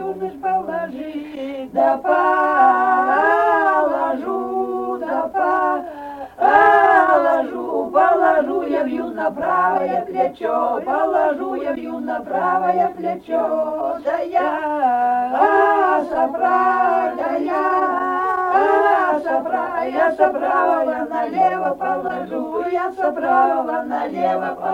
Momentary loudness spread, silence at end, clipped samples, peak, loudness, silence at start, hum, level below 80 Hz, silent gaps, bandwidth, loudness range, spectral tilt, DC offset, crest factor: 10 LU; 0 s; under 0.1%; -2 dBFS; -18 LUFS; 0 s; none; -58 dBFS; none; 9.6 kHz; 4 LU; -6 dB/octave; under 0.1%; 16 dB